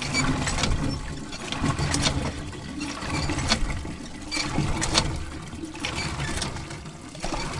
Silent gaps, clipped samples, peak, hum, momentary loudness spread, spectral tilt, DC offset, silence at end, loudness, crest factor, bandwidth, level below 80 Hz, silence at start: none; under 0.1%; -4 dBFS; none; 12 LU; -3.5 dB/octave; under 0.1%; 0 s; -28 LUFS; 24 dB; 11.5 kHz; -36 dBFS; 0 s